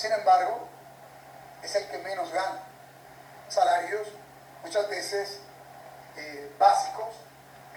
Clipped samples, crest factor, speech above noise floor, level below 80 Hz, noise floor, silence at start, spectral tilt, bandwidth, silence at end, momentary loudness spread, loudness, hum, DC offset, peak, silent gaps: under 0.1%; 22 dB; 23 dB; -72 dBFS; -50 dBFS; 0 s; -2 dB/octave; over 20 kHz; 0 s; 26 LU; -27 LUFS; none; under 0.1%; -6 dBFS; none